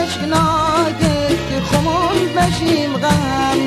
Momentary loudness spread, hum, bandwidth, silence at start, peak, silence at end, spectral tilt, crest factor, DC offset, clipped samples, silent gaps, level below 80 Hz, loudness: 3 LU; none; 15.5 kHz; 0 s; -2 dBFS; 0 s; -5 dB/octave; 14 dB; under 0.1%; under 0.1%; none; -34 dBFS; -16 LUFS